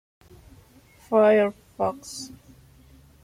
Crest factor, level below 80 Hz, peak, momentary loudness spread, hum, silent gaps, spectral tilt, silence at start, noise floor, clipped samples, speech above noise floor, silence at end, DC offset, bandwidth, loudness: 18 dB; -58 dBFS; -8 dBFS; 19 LU; none; none; -5 dB/octave; 1.1 s; -54 dBFS; under 0.1%; 32 dB; 0.95 s; under 0.1%; 15.5 kHz; -22 LUFS